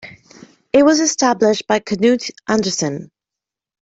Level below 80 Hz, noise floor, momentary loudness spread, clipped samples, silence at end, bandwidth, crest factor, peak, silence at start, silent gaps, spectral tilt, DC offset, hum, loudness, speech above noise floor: -56 dBFS; -86 dBFS; 8 LU; under 0.1%; 0.85 s; 8 kHz; 16 dB; -2 dBFS; 0.05 s; none; -3.5 dB/octave; under 0.1%; none; -16 LUFS; 70 dB